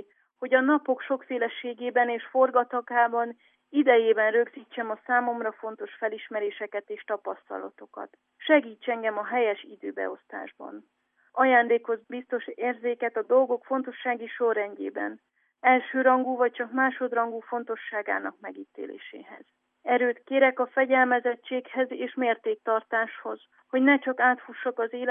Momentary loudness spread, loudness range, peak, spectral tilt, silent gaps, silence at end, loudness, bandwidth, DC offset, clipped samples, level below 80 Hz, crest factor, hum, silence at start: 17 LU; 5 LU; -6 dBFS; -7.5 dB/octave; none; 0 s; -26 LUFS; 3.7 kHz; under 0.1%; under 0.1%; under -90 dBFS; 20 dB; none; 0.4 s